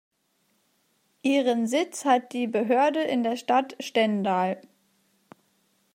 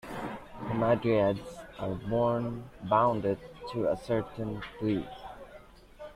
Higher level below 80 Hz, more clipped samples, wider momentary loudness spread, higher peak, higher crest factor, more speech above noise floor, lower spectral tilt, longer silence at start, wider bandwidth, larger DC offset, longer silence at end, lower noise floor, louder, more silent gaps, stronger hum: second, -82 dBFS vs -54 dBFS; neither; second, 6 LU vs 18 LU; first, -8 dBFS vs -12 dBFS; about the same, 18 dB vs 20 dB; first, 46 dB vs 22 dB; second, -4.5 dB/octave vs -8 dB/octave; first, 1.25 s vs 0.05 s; first, 16 kHz vs 14 kHz; neither; first, 1.35 s vs 0 s; first, -71 dBFS vs -52 dBFS; first, -25 LUFS vs -31 LUFS; neither; neither